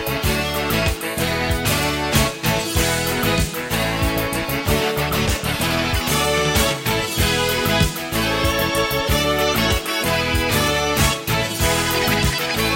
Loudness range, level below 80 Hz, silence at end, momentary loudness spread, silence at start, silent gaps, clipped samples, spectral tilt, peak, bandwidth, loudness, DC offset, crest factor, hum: 2 LU; -30 dBFS; 0 s; 3 LU; 0 s; none; under 0.1%; -3.5 dB/octave; -2 dBFS; 16.5 kHz; -19 LUFS; under 0.1%; 16 dB; none